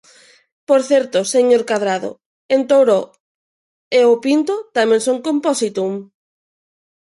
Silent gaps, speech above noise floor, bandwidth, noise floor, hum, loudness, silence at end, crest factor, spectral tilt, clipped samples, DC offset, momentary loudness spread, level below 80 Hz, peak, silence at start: 2.26-2.49 s, 3.20-3.91 s; over 75 dB; 11.5 kHz; under -90 dBFS; none; -16 LUFS; 1.1 s; 14 dB; -4 dB/octave; under 0.1%; under 0.1%; 9 LU; -70 dBFS; -2 dBFS; 0.7 s